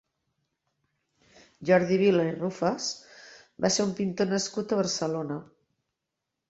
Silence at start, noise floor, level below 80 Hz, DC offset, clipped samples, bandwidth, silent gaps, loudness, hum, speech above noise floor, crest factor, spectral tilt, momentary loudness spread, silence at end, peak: 1.6 s; -85 dBFS; -68 dBFS; under 0.1%; under 0.1%; 8.2 kHz; none; -27 LUFS; none; 58 dB; 20 dB; -4.5 dB/octave; 11 LU; 1.05 s; -8 dBFS